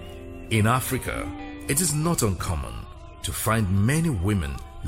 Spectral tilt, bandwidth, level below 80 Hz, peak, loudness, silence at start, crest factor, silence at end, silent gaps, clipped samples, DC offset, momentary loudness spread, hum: -5 dB/octave; 16.5 kHz; -38 dBFS; -10 dBFS; -25 LUFS; 0 s; 16 dB; 0 s; none; under 0.1%; under 0.1%; 14 LU; none